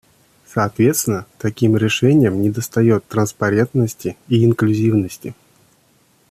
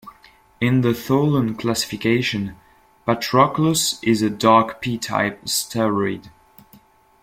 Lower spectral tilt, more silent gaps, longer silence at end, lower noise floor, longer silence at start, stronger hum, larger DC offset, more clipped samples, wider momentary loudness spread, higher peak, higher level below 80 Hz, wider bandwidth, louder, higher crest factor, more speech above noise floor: first, -6 dB/octave vs -4.5 dB/octave; neither; about the same, 1 s vs 0.95 s; first, -57 dBFS vs -52 dBFS; first, 0.55 s vs 0.05 s; neither; neither; neither; about the same, 11 LU vs 9 LU; about the same, -4 dBFS vs -2 dBFS; about the same, -54 dBFS vs -54 dBFS; about the same, 15.5 kHz vs 16.5 kHz; first, -17 LUFS vs -20 LUFS; about the same, 14 dB vs 18 dB; first, 40 dB vs 33 dB